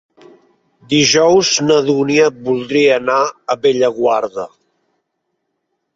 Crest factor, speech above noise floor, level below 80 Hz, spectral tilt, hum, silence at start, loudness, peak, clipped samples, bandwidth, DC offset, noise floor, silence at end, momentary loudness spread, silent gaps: 14 dB; 58 dB; -56 dBFS; -3.5 dB/octave; none; 0.9 s; -13 LUFS; 0 dBFS; under 0.1%; 7.8 kHz; under 0.1%; -72 dBFS; 1.5 s; 8 LU; none